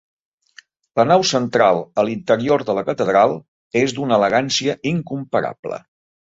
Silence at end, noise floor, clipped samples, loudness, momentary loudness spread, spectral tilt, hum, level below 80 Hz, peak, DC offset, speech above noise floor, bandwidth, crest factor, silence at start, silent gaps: 0.4 s; -49 dBFS; under 0.1%; -18 LUFS; 10 LU; -4.5 dB/octave; none; -58 dBFS; -2 dBFS; under 0.1%; 32 dB; 8 kHz; 16 dB; 0.95 s; 3.48-3.71 s, 5.59-5.63 s